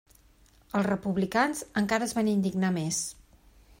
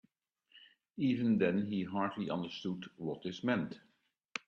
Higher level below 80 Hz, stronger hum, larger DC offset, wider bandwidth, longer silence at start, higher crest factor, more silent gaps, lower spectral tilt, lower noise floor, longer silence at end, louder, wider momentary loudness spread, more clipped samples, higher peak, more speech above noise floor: first, -60 dBFS vs -74 dBFS; neither; neither; first, 16 kHz vs 7.8 kHz; first, 0.75 s vs 0.55 s; about the same, 20 dB vs 20 dB; second, none vs 4.25-4.29 s; second, -5 dB/octave vs -7 dB/octave; second, -60 dBFS vs -74 dBFS; first, 0.7 s vs 0.1 s; first, -28 LUFS vs -36 LUFS; second, 4 LU vs 13 LU; neither; first, -10 dBFS vs -18 dBFS; second, 32 dB vs 39 dB